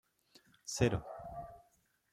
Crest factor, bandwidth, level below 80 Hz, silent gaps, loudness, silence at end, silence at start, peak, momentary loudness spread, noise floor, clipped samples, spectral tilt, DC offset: 24 dB; 15.5 kHz; -58 dBFS; none; -37 LUFS; 0.5 s; 0.65 s; -16 dBFS; 17 LU; -74 dBFS; under 0.1%; -5 dB/octave; under 0.1%